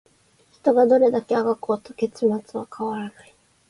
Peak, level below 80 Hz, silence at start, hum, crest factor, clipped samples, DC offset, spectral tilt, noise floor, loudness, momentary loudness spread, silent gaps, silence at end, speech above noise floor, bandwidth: -6 dBFS; -68 dBFS; 0.65 s; none; 16 dB; under 0.1%; under 0.1%; -7 dB/octave; -59 dBFS; -22 LUFS; 14 LU; none; 0.6 s; 38 dB; 11.5 kHz